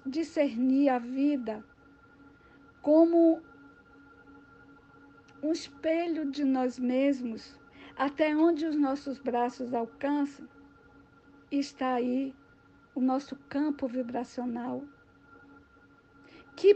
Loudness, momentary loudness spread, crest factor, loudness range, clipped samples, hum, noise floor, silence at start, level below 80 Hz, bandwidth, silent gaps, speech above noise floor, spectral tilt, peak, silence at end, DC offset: -29 LUFS; 13 LU; 20 dB; 6 LU; under 0.1%; none; -60 dBFS; 0.05 s; -70 dBFS; 8.4 kHz; none; 31 dB; -5.5 dB/octave; -10 dBFS; 0 s; under 0.1%